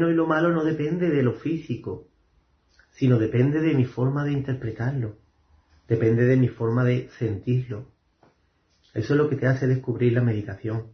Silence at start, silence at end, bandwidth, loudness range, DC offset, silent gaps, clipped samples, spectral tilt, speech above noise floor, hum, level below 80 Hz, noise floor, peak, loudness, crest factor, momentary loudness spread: 0 s; 0.05 s; 6.4 kHz; 1 LU; under 0.1%; none; under 0.1%; -9.5 dB/octave; 43 dB; none; -56 dBFS; -66 dBFS; -8 dBFS; -24 LUFS; 16 dB; 11 LU